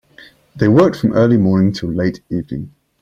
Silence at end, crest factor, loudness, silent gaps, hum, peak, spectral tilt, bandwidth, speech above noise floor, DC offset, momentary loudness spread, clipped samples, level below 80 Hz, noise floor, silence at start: 0.35 s; 14 dB; -15 LUFS; none; none; -2 dBFS; -8.5 dB/octave; 7.4 kHz; 31 dB; under 0.1%; 15 LU; under 0.1%; -46 dBFS; -45 dBFS; 0.55 s